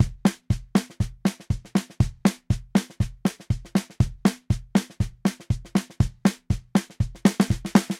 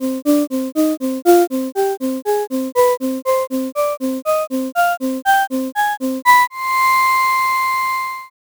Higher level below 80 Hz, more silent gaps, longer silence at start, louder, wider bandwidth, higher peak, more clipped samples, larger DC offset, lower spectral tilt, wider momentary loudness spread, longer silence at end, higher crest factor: first, -36 dBFS vs -58 dBFS; neither; about the same, 0 s vs 0 s; second, -26 LUFS vs -17 LUFS; second, 15.5 kHz vs over 20 kHz; about the same, -2 dBFS vs 0 dBFS; neither; neither; first, -6.5 dB/octave vs -2.5 dB/octave; about the same, 7 LU vs 7 LU; second, 0 s vs 0.2 s; first, 22 dB vs 16 dB